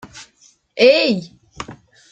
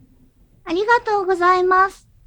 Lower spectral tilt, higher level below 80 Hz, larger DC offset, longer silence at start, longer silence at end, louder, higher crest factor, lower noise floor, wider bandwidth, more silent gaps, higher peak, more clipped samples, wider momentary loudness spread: about the same, -4.5 dB/octave vs -4 dB/octave; about the same, -56 dBFS vs -52 dBFS; neither; second, 0.15 s vs 0.65 s; about the same, 0.4 s vs 0.35 s; about the same, -15 LUFS vs -17 LUFS; about the same, 18 dB vs 16 dB; about the same, -55 dBFS vs -53 dBFS; second, 8.6 kHz vs 10 kHz; neither; about the same, -2 dBFS vs -4 dBFS; neither; first, 22 LU vs 7 LU